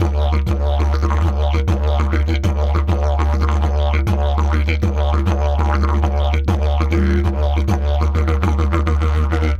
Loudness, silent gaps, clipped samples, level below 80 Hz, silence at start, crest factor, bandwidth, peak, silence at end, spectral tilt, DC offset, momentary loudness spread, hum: -18 LUFS; none; under 0.1%; -18 dBFS; 0 s; 14 dB; 7 kHz; 0 dBFS; 0 s; -7.5 dB/octave; under 0.1%; 1 LU; none